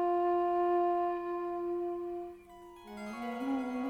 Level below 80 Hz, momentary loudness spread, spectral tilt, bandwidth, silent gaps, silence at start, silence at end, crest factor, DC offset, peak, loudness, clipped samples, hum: -68 dBFS; 18 LU; -6.5 dB/octave; 8.8 kHz; none; 0 s; 0 s; 12 dB; under 0.1%; -22 dBFS; -34 LUFS; under 0.1%; none